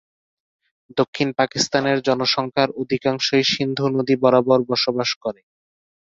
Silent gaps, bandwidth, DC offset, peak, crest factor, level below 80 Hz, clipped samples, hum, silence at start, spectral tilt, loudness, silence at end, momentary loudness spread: 1.08-1.13 s, 5.16-5.21 s; 7.8 kHz; under 0.1%; -2 dBFS; 20 dB; -62 dBFS; under 0.1%; none; 0.95 s; -4.5 dB/octave; -20 LUFS; 0.85 s; 7 LU